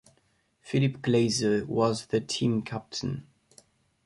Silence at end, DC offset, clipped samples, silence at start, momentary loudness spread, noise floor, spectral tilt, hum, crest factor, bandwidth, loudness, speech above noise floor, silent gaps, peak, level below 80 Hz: 0.85 s; under 0.1%; under 0.1%; 0.65 s; 9 LU; -69 dBFS; -5.5 dB/octave; none; 18 dB; 11.5 kHz; -28 LUFS; 42 dB; none; -12 dBFS; -60 dBFS